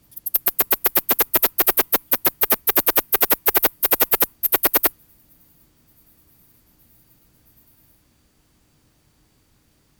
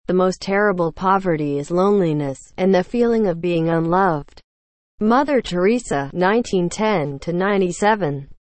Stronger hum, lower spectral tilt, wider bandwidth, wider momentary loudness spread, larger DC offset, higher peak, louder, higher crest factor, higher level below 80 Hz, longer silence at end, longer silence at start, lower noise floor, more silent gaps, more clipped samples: neither; second, -1.5 dB/octave vs -6.5 dB/octave; first, over 20 kHz vs 8.8 kHz; second, 3 LU vs 6 LU; neither; about the same, -2 dBFS vs -4 dBFS; about the same, -17 LUFS vs -19 LUFS; first, 22 dB vs 14 dB; second, -54 dBFS vs -46 dBFS; first, 5.1 s vs 0.25 s; about the same, 0.15 s vs 0.1 s; second, -61 dBFS vs under -90 dBFS; second, none vs 4.44-4.98 s; neither